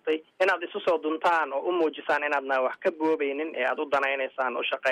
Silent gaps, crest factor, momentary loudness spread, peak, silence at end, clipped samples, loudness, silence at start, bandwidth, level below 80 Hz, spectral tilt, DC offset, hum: none; 14 dB; 3 LU; -12 dBFS; 0 s; under 0.1%; -27 LUFS; 0.05 s; 11.5 kHz; -76 dBFS; -4 dB/octave; under 0.1%; none